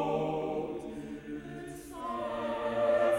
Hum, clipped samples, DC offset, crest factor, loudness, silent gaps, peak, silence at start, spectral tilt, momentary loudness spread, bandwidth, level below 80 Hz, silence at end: none; under 0.1%; under 0.1%; 14 dB; -35 LUFS; none; -18 dBFS; 0 s; -6 dB/octave; 13 LU; 13.5 kHz; -60 dBFS; 0 s